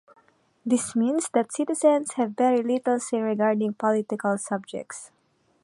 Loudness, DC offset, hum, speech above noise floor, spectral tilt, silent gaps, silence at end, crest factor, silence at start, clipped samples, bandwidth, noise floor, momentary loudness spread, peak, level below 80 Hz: -24 LUFS; under 0.1%; none; 36 dB; -5 dB/octave; none; 0.55 s; 18 dB; 0.65 s; under 0.1%; 11.5 kHz; -60 dBFS; 11 LU; -6 dBFS; -76 dBFS